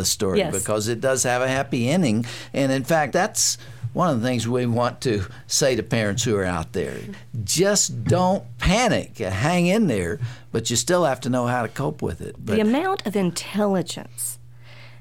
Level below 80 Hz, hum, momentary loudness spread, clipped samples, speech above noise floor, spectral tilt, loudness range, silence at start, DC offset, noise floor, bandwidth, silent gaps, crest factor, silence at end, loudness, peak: -44 dBFS; none; 9 LU; under 0.1%; 22 dB; -4 dB/octave; 2 LU; 0 s; 0.5%; -44 dBFS; 17 kHz; none; 16 dB; 0 s; -22 LUFS; -6 dBFS